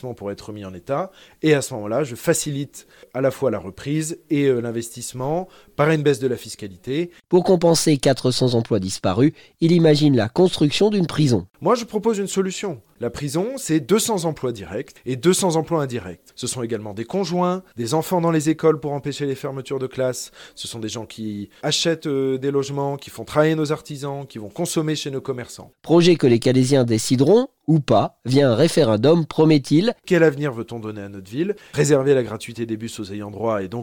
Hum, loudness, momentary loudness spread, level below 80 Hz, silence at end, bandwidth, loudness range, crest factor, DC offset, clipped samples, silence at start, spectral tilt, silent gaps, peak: none; -20 LUFS; 14 LU; -54 dBFS; 0 s; 18 kHz; 7 LU; 16 dB; under 0.1%; under 0.1%; 0.05 s; -5.5 dB/octave; none; -4 dBFS